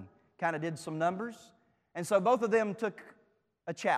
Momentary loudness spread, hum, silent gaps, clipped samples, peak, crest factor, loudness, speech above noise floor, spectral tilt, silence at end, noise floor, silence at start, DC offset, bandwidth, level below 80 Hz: 16 LU; none; none; under 0.1%; -14 dBFS; 18 dB; -32 LUFS; 40 dB; -5.5 dB/octave; 0 s; -71 dBFS; 0 s; under 0.1%; 15 kHz; -80 dBFS